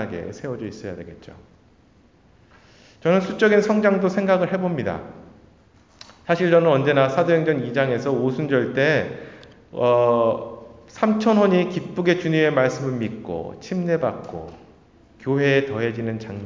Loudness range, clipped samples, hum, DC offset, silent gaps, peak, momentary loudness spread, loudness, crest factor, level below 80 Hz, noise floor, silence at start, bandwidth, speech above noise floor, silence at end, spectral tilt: 5 LU; under 0.1%; none; under 0.1%; none; -4 dBFS; 17 LU; -21 LUFS; 18 dB; -56 dBFS; -55 dBFS; 0 s; 7.6 kHz; 34 dB; 0 s; -7 dB/octave